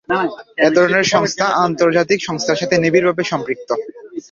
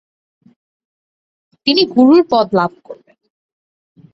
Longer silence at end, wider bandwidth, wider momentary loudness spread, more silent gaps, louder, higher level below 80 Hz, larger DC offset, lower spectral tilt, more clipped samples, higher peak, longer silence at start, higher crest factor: second, 0.1 s vs 1.2 s; first, 7.6 kHz vs 6.2 kHz; about the same, 10 LU vs 10 LU; neither; second, -16 LUFS vs -13 LUFS; about the same, -56 dBFS vs -60 dBFS; neither; second, -4.5 dB/octave vs -7 dB/octave; neither; about the same, -2 dBFS vs -2 dBFS; second, 0.1 s vs 1.65 s; about the same, 16 dB vs 16 dB